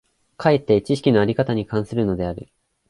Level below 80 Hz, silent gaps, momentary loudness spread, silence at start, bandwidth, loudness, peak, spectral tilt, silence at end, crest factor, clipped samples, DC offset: -46 dBFS; none; 8 LU; 0.4 s; 11.5 kHz; -20 LUFS; -4 dBFS; -7.5 dB/octave; 0.45 s; 16 dB; under 0.1%; under 0.1%